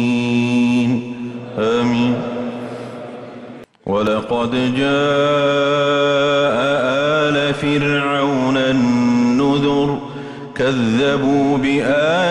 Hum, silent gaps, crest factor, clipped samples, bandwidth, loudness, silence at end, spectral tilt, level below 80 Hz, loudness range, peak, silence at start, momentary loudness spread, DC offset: none; none; 10 dB; under 0.1%; 10.5 kHz; -16 LUFS; 0 s; -6 dB/octave; -50 dBFS; 5 LU; -6 dBFS; 0 s; 14 LU; under 0.1%